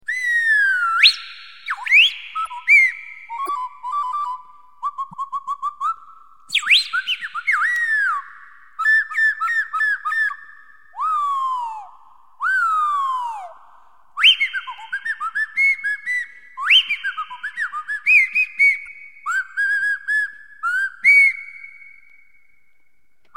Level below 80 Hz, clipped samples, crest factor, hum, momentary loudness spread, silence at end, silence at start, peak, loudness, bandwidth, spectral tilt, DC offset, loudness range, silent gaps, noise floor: -72 dBFS; under 0.1%; 20 dB; none; 17 LU; 1.65 s; 0.1 s; 0 dBFS; -17 LUFS; 16.5 kHz; 3 dB/octave; 0.4%; 6 LU; none; -67 dBFS